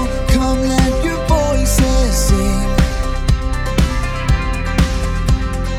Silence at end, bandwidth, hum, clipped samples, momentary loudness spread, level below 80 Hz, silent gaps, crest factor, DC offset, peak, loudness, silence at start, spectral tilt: 0 s; 16 kHz; none; under 0.1%; 4 LU; -16 dBFS; none; 14 dB; under 0.1%; 0 dBFS; -16 LUFS; 0 s; -5.5 dB/octave